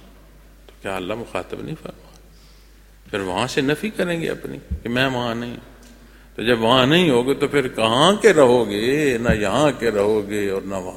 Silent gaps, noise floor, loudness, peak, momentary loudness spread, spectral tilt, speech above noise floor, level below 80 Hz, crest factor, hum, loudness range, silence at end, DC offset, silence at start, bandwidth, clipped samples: none; -47 dBFS; -19 LUFS; 0 dBFS; 17 LU; -5 dB/octave; 28 dB; -42 dBFS; 20 dB; none; 10 LU; 0 s; under 0.1%; 0.85 s; 16.5 kHz; under 0.1%